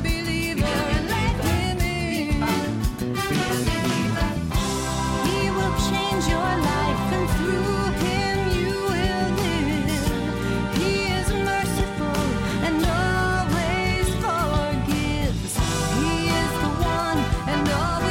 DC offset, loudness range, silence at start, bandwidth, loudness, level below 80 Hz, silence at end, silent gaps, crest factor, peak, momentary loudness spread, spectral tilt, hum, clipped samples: under 0.1%; 1 LU; 0 s; 17 kHz; -23 LUFS; -32 dBFS; 0 s; none; 12 dB; -10 dBFS; 3 LU; -5 dB/octave; none; under 0.1%